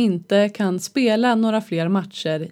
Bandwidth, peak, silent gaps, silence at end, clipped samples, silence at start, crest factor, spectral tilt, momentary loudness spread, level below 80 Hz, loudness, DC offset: 14 kHz; -6 dBFS; none; 0 s; under 0.1%; 0 s; 14 dB; -5.5 dB/octave; 6 LU; -76 dBFS; -20 LUFS; under 0.1%